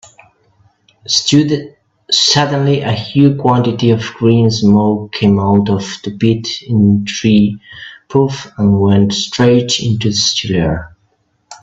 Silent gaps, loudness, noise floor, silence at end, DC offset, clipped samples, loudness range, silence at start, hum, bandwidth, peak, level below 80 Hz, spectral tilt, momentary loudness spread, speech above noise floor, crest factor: none; -13 LUFS; -60 dBFS; 0.05 s; under 0.1%; under 0.1%; 2 LU; 1.1 s; none; 8 kHz; 0 dBFS; -44 dBFS; -5.5 dB/octave; 7 LU; 47 dB; 14 dB